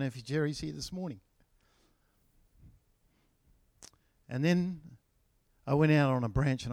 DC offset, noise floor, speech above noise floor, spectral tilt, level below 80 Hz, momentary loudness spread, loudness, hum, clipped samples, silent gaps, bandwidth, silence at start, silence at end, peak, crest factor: under 0.1%; -72 dBFS; 42 dB; -7 dB/octave; -54 dBFS; 17 LU; -31 LUFS; none; under 0.1%; none; 13 kHz; 0 s; 0 s; -14 dBFS; 20 dB